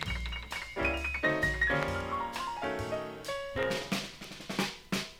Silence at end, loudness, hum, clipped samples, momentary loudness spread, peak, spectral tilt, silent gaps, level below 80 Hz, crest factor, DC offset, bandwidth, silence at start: 0 s; -33 LUFS; none; under 0.1%; 9 LU; -14 dBFS; -4 dB/octave; none; -46 dBFS; 20 dB; under 0.1%; 17 kHz; 0 s